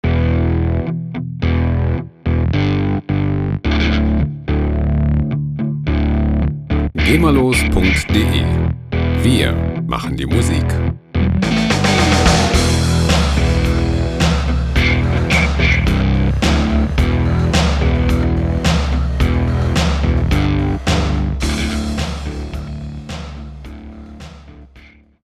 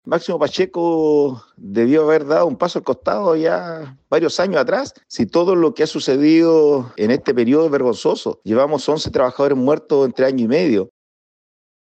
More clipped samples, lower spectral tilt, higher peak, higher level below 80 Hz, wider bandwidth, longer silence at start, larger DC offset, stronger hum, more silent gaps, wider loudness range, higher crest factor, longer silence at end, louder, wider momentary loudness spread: neither; about the same, -6 dB/octave vs -6 dB/octave; first, 0 dBFS vs -4 dBFS; first, -20 dBFS vs -56 dBFS; first, 14 kHz vs 8.6 kHz; about the same, 0.05 s vs 0.05 s; neither; neither; neither; about the same, 4 LU vs 3 LU; about the same, 16 dB vs 12 dB; second, 0.45 s vs 1.05 s; about the same, -16 LUFS vs -17 LUFS; first, 10 LU vs 7 LU